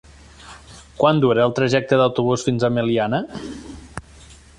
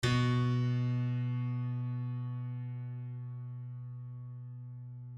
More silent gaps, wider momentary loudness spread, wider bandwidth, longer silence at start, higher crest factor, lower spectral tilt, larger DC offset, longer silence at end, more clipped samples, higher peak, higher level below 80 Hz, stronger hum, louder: neither; first, 20 LU vs 15 LU; first, 11.5 kHz vs 9.6 kHz; first, 0.4 s vs 0 s; about the same, 18 dB vs 16 dB; about the same, -6 dB/octave vs -7 dB/octave; neither; first, 0.25 s vs 0 s; neither; first, -4 dBFS vs -18 dBFS; first, -48 dBFS vs -60 dBFS; neither; first, -19 LUFS vs -36 LUFS